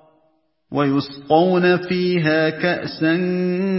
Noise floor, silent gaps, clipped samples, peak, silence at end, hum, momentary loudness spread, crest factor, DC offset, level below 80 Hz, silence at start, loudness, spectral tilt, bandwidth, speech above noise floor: -64 dBFS; none; under 0.1%; -2 dBFS; 0 s; none; 6 LU; 18 dB; under 0.1%; -60 dBFS; 0.7 s; -19 LUFS; -10.5 dB/octave; 5.8 kHz; 46 dB